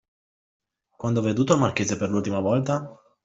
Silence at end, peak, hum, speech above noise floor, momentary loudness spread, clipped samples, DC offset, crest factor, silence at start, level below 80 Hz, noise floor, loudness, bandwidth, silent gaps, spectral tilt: 0.3 s; -4 dBFS; none; over 67 dB; 8 LU; under 0.1%; under 0.1%; 20 dB; 1 s; -60 dBFS; under -90 dBFS; -24 LUFS; 8 kHz; none; -6 dB/octave